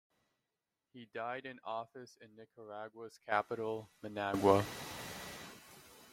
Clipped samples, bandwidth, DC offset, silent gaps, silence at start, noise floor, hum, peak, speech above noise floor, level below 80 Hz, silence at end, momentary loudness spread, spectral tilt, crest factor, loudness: under 0.1%; 16.5 kHz; under 0.1%; none; 0.95 s; -89 dBFS; none; -12 dBFS; 52 dB; -72 dBFS; 0 s; 25 LU; -5 dB/octave; 28 dB; -38 LUFS